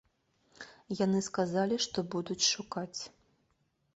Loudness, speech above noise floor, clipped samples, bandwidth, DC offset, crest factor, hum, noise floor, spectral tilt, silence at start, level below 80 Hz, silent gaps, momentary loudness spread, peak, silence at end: -32 LUFS; 43 dB; under 0.1%; 8.2 kHz; under 0.1%; 20 dB; none; -76 dBFS; -3.5 dB/octave; 0.6 s; -70 dBFS; none; 19 LU; -16 dBFS; 0.85 s